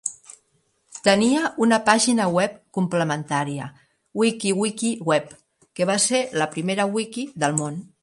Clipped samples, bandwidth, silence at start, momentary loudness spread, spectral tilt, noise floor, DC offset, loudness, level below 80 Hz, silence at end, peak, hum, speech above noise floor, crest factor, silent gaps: under 0.1%; 11.5 kHz; 0.05 s; 13 LU; -4 dB/octave; -67 dBFS; under 0.1%; -22 LUFS; -66 dBFS; 0.15 s; 0 dBFS; none; 45 dB; 22 dB; none